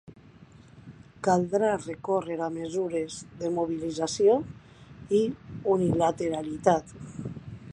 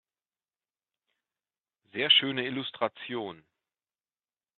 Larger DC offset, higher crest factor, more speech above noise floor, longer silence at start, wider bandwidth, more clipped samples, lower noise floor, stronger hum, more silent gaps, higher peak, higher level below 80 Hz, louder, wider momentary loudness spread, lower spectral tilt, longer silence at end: neither; about the same, 22 dB vs 26 dB; second, 25 dB vs over 61 dB; second, 0.1 s vs 1.95 s; first, 10.5 kHz vs 4.5 kHz; neither; second, -52 dBFS vs under -90 dBFS; neither; neither; about the same, -6 dBFS vs -8 dBFS; first, -58 dBFS vs -80 dBFS; about the same, -27 LUFS vs -27 LUFS; about the same, 16 LU vs 17 LU; first, -6 dB/octave vs -0.5 dB/octave; second, 0 s vs 1.2 s